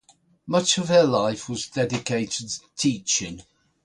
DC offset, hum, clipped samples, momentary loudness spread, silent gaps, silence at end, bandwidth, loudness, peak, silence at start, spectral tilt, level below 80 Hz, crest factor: under 0.1%; none; under 0.1%; 12 LU; none; 0.45 s; 11 kHz; -23 LUFS; -6 dBFS; 0.45 s; -3.5 dB/octave; -58 dBFS; 18 dB